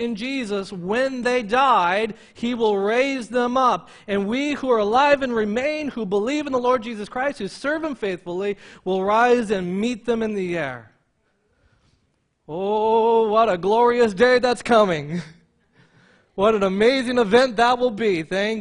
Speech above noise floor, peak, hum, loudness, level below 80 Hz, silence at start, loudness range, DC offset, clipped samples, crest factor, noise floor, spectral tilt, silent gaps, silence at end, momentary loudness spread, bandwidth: 48 dB; -2 dBFS; none; -21 LUFS; -56 dBFS; 0 s; 5 LU; under 0.1%; under 0.1%; 18 dB; -68 dBFS; -5 dB/octave; none; 0 s; 10 LU; 10.5 kHz